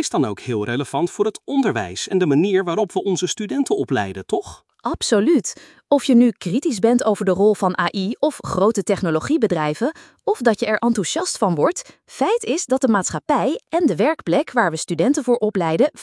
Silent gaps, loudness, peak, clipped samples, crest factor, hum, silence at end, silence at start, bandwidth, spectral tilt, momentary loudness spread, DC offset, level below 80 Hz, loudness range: none; -20 LUFS; -2 dBFS; under 0.1%; 16 dB; none; 0 s; 0 s; 12 kHz; -5 dB/octave; 7 LU; under 0.1%; -56 dBFS; 3 LU